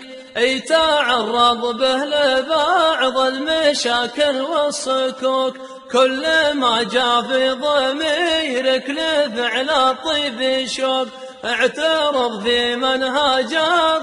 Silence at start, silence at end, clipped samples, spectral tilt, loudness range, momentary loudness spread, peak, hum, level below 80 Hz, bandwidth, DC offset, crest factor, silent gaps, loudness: 0 s; 0 s; under 0.1%; -2 dB/octave; 2 LU; 4 LU; -2 dBFS; none; -54 dBFS; 11.5 kHz; under 0.1%; 16 dB; none; -17 LUFS